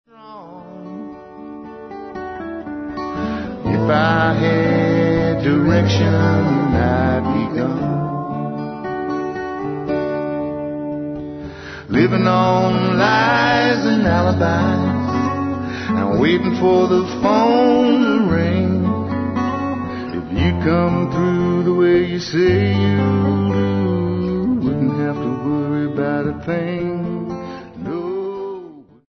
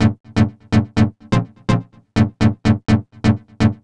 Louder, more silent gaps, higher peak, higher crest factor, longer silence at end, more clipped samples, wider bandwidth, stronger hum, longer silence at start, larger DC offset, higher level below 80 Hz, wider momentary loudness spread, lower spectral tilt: about the same, -18 LUFS vs -19 LUFS; second, none vs 0.20-0.24 s; about the same, -2 dBFS vs -2 dBFS; about the same, 16 dB vs 14 dB; first, 0.25 s vs 0.1 s; neither; second, 6.4 kHz vs 9.8 kHz; neither; first, 0.2 s vs 0 s; neither; second, -42 dBFS vs -36 dBFS; first, 14 LU vs 5 LU; about the same, -7.5 dB/octave vs -7.5 dB/octave